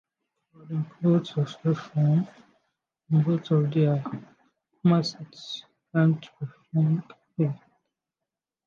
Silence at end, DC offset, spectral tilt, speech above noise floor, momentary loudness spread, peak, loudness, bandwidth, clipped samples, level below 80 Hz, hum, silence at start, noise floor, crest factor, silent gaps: 1.1 s; under 0.1%; -8.5 dB/octave; 64 dB; 15 LU; -10 dBFS; -26 LUFS; 7 kHz; under 0.1%; -74 dBFS; none; 0.65 s; -88 dBFS; 16 dB; none